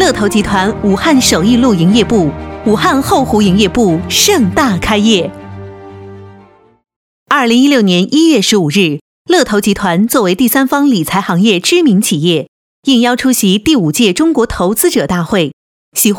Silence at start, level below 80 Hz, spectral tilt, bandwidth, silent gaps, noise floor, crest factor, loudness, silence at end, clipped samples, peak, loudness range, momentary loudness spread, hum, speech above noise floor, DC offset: 0 s; -36 dBFS; -4.5 dB/octave; 19 kHz; 6.96-7.26 s, 9.01-9.25 s, 12.48-12.83 s, 15.53-15.92 s; -42 dBFS; 10 dB; -10 LUFS; 0 s; 0.1%; 0 dBFS; 3 LU; 6 LU; none; 32 dB; under 0.1%